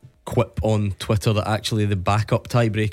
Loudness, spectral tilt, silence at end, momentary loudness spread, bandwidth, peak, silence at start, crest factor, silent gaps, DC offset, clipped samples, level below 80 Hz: -22 LUFS; -6.5 dB/octave; 0 s; 3 LU; 14.5 kHz; -6 dBFS; 0.25 s; 16 dB; none; under 0.1%; under 0.1%; -42 dBFS